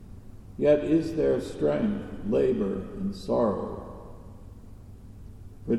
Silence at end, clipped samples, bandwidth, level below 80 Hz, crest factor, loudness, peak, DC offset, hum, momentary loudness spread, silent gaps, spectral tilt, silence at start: 0 s; under 0.1%; 12.5 kHz; -48 dBFS; 18 dB; -27 LUFS; -10 dBFS; under 0.1%; none; 24 LU; none; -8 dB/octave; 0 s